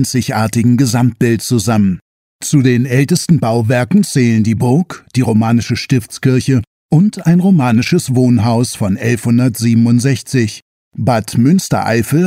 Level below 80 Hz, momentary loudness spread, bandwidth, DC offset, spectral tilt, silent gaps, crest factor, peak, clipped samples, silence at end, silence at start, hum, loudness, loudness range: -48 dBFS; 5 LU; 16 kHz; under 0.1%; -6 dB/octave; 2.02-2.39 s, 6.67-6.89 s, 10.62-10.91 s; 12 dB; 0 dBFS; under 0.1%; 0 s; 0 s; none; -13 LUFS; 1 LU